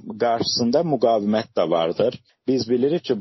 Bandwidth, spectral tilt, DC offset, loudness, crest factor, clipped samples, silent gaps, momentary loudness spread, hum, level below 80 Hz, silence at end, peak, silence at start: 6.2 kHz; -4.5 dB/octave; under 0.1%; -21 LUFS; 14 dB; under 0.1%; none; 5 LU; none; -62 dBFS; 0 s; -6 dBFS; 0.05 s